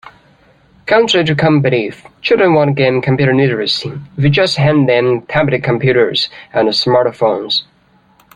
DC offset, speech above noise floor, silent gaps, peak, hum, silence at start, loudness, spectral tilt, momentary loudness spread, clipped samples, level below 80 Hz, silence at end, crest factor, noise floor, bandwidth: under 0.1%; 38 dB; none; 0 dBFS; none; 0.05 s; -13 LUFS; -6 dB/octave; 6 LU; under 0.1%; -48 dBFS; 0.7 s; 14 dB; -51 dBFS; 10 kHz